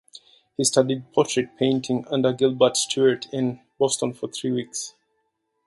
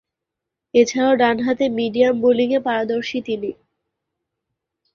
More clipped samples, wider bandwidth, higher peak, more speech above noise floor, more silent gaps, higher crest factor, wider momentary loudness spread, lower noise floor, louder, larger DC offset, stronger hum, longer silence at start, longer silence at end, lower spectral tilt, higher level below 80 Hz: neither; first, 11.5 kHz vs 7.2 kHz; about the same, -4 dBFS vs -2 dBFS; second, 51 dB vs 65 dB; neither; about the same, 20 dB vs 18 dB; about the same, 9 LU vs 9 LU; second, -74 dBFS vs -83 dBFS; second, -23 LUFS vs -18 LUFS; neither; neither; second, 0.6 s vs 0.75 s; second, 0.8 s vs 1.4 s; about the same, -4 dB/octave vs -4.5 dB/octave; second, -66 dBFS vs -60 dBFS